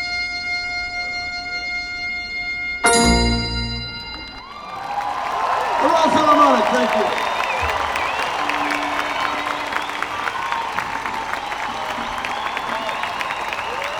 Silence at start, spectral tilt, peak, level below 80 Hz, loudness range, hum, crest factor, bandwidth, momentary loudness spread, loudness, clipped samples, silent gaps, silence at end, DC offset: 0 s; -3 dB/octave; -2 dBFS; -36 dBFS; 7 LU; none; 20 dB; over 20 kHz; 10 LU; -20 LUFS; under 0.1%; none; 0 s; under 0.1%